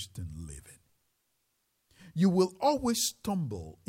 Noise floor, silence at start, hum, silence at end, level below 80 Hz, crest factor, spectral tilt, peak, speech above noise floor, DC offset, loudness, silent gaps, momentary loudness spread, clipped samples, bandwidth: -77 dBFS; 0 s; none; 0.15 s; -56 dBFS; 18 dB; -5 dB/octave; -14 dBFS; 47 dB; under 0.1%; -29 LUFS; none; 18 LU; under 0.1%; 16 kHz